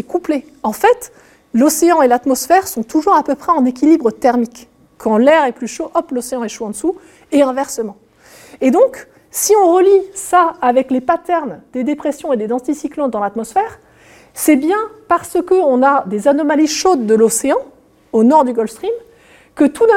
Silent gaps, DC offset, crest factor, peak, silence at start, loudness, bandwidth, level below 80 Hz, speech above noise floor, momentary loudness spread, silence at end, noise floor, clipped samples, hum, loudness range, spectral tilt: none; under 0.1%; 14 dB; 0 dBFS; 0.1 s; -14 LUFS; 17 kHz; -54 dBFS; 31 dB; 11 LU; 0 s; -45 dBFS; under 0.1%; none; 5 LU; -4 dB/octave